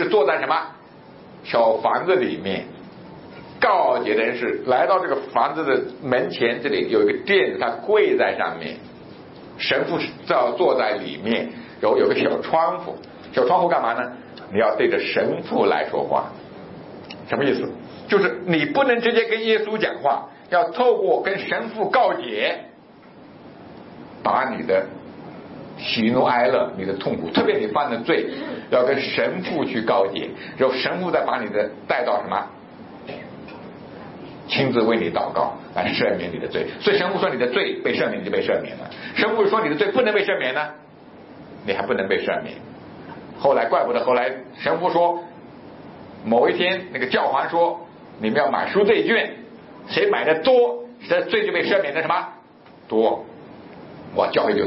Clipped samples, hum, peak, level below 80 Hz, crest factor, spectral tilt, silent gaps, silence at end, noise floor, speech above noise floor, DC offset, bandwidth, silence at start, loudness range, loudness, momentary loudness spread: under 0.1%; none; -4 dBFS; -64 dBFS; 18 dB; -9.5 dB/octave; none; 0 s; -47 dBFS; 27 dB; under 0.1%; 5.8 kHz; 0 s; 4 LU; -21 LUFS; 20 LU